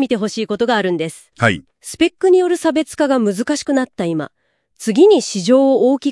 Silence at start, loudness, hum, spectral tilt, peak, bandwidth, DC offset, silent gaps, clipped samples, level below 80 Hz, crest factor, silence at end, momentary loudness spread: 0 s; -16 LUFS; none; -5 dB/octave; 0 dBFS; 12 kHz; under 0.1%; none; under 0.1%; -56 dBFS; 16 dB; 0 s; 12 LU